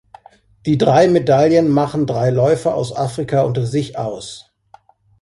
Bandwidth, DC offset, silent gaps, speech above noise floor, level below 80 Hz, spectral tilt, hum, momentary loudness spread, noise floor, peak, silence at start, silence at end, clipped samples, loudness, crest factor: 11.5 kHz; under 0.1%; none; 34 dB; -50 dBFS; -7 dB/octave; none; 13 LU; -49 dBFS; 0 dBFS; 0.65 s; 0.8 s; under 0.1%; -16 LUFS; 16 dB